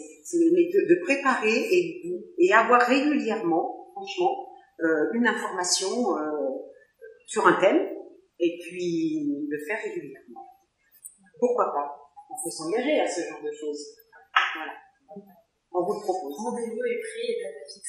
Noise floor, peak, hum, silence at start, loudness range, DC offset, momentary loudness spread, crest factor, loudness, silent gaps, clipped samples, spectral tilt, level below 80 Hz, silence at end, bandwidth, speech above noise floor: -62 dBFS; -4 dBFS; none; 0 s; 9 LU; under 0.1%; 17 LU; 22 dB; -25 LUFS; none; under 0.1%; -3.5 dB/octave; -82 dBFS; 0 s; 14 kHz; 37 dB